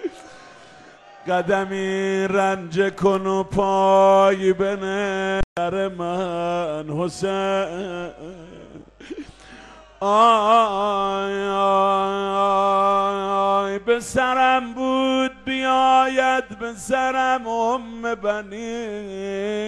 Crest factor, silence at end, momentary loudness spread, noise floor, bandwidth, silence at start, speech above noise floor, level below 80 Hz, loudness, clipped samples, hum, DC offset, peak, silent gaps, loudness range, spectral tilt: 16 dB; 0 s; 14 LU; -46 dBFS; 12.5 kHz; 0 s; 26 dB; -46 dBFS; -20 LUFS; under 0.1%; none; under 0.1%; -4 dBFS; 5.44-5.56 s; 6 LU; -5 dB/octave